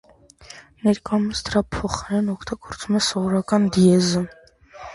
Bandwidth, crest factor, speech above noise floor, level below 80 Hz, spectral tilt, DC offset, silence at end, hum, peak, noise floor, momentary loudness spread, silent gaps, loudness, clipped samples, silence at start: 11.5 kHz; 18 dB; 26 dB; -44 dBFS; -5.5 dB/octave; under 0.1%; 0 s; none; -4 dBFS; -46 dBFS; 16 LU; none; -21 LUFS; under 0.1%; 0.5 s